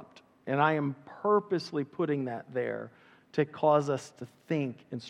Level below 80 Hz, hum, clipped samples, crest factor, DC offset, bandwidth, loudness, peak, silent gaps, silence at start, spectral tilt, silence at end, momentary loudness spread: -82 dBFS; none; under 0.1%; 20 dB; under 0.1%; 11 kHz; -31 LUFS; -12 dBFS; none; 0 s; -7 dB/octave; 0 s; 13 LU